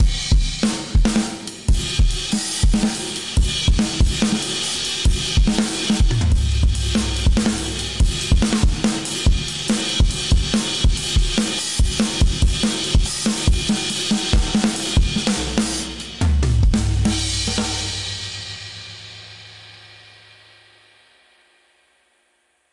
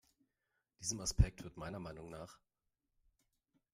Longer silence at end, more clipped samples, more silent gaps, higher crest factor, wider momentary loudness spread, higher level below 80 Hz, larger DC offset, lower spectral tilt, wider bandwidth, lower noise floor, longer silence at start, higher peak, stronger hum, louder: first, 2.7 s vs 1.4 s; neither; neither; second, 18 dB vs 26 dB; second, 7 LU vs 17 LU; first, -22 dBFS vs -46 dBFS; first, 0.4% vs under 0.1%; about the same, -4 dB/octave vs -4.5 dB/octave; second, 11.5 kHz vs 15.5 kHz; second, -64 dBFS vs -88 dBFS; second, 0 s vs 0.8 s; first, -2 dBFS vs -16 dBFS; neither; first, -20 LUFS vs -40 LUFS